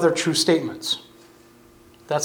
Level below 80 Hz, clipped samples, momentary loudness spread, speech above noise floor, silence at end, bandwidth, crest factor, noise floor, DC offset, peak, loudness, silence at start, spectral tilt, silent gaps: -64 dBFS; under 0.1%; 9 LU; 30 dB; 0 s; 18.5 kHz; 18 dB; -51 dBFS; under 0.1%; -6 dBFS; -22 LUFS; 0 s; -3.5 dB/octave; none